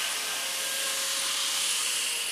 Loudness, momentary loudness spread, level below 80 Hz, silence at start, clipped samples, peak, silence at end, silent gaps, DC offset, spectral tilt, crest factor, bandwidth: -26 LUFS; 3 LU; -74 dBFS; 0 s; under 0.1%; -16 dBFS; 0 s; none; under 0.1%; 3 dB/octave; 14 dB; 16 kHz